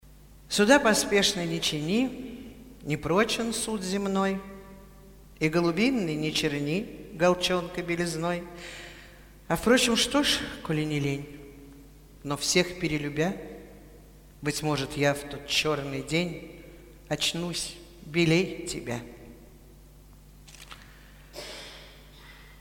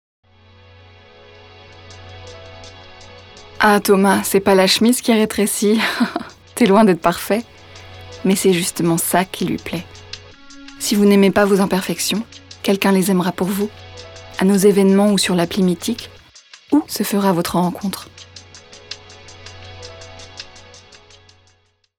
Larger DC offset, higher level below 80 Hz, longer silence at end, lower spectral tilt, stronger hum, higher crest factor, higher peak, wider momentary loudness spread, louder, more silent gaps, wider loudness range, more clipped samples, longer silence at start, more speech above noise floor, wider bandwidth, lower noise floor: neither; about the same, -52 dBFS vs -52 dBFS; second, 0 s vs 1.4 s; about the same, -4 dB/octave vs -4.5 dB/octave; neither; about the same, 22 dB vs 18 dB; second, -6 dBFS vs -2 dBFS; about the same, 22 LU vs 24 LU; second, -27 LUFS vs -16 LUFS; neither; second, 5 LU vs 9 LU; neither; second, 0.05 s vs 1.9 s; second, 25 dB vs 44 dB; about the same, 18.5 kHz vs 19.5 kHz; second, -51 dBFS vs -59 dBFS